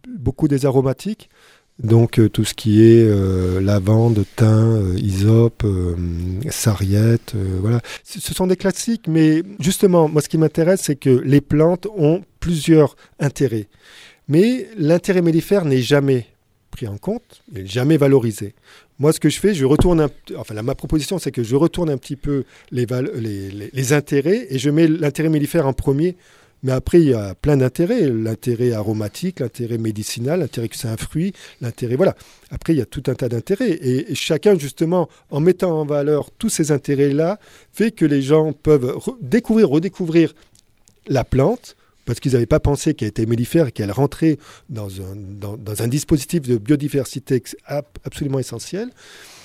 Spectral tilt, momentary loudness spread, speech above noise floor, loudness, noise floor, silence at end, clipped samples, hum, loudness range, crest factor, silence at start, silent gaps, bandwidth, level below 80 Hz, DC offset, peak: -6.5 dB/octave; 13 LU; 36 dB; -18 LUFS; -54 dBFS; 0.55 s; under 0.1%; none; 6 LU; 18 dB; 0.05 s; none; 16 kHz; -38 dBFS; under 0.1%; 0 dBFS